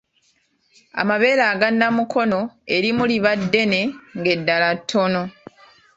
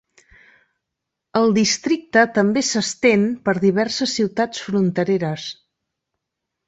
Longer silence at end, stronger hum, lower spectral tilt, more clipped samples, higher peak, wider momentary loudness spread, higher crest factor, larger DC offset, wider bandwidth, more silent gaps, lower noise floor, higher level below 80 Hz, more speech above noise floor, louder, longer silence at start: second, 0.65 s vs 1.15 s; neither; about the same, -5.5 dB/octave vs -4.5 dB/octave; neither; about the same, -2 dBFS vs -2 dBFS; about the same, 8 LU vs 6 LU; about the same, 18 dB vs 18 dB; neither; about the same, 8 kHz vs 8.2 kHz; neither; second, -64 dBFS vs -81 dBFS; about the same, -60 dBFS vs -60 dBFS; second, 45 dB vs 63 dB; about the same, -19 LUFS vs -19 LUFS; second, 0.95 s vs 1.35 s